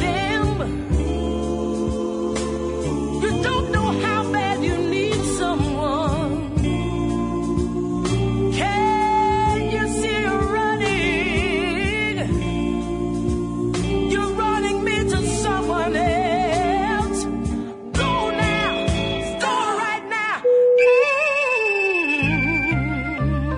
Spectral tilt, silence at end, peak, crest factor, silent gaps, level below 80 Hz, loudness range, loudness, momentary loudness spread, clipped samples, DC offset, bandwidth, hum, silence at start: -5.5 dB/octave; 0 s; -6 dBFS; 14 dB; none; -34 dBFS; 4 LU; -21 LUFS; 6 LU; under 0.1%; under 0.1%; 11 kHz; none; 0 s